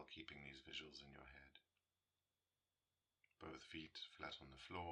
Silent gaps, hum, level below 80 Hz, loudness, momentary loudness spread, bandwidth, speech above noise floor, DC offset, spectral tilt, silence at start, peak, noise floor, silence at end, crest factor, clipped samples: none; none; -78 dBFS; -56 LUFS; 9 LU; 9.6 kHz; over 33 dB; under 0.1%; -4 dB/octave; 0 s; -36 dBFS; under -90 dBFS; 0 s; 22 dB; under 0.1%